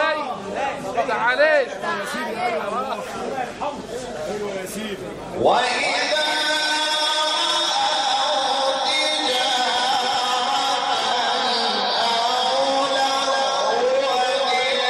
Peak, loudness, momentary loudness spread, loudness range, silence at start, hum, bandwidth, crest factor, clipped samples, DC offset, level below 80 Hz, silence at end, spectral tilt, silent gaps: -4 dBFS; -20 LUFS; 9 LU; 6 LU; 0 s; none; 15 kHz; 16 dB; under 0.1%; under 0.1%; -58 dBFS; 0 s; -1.5 dB/octave; none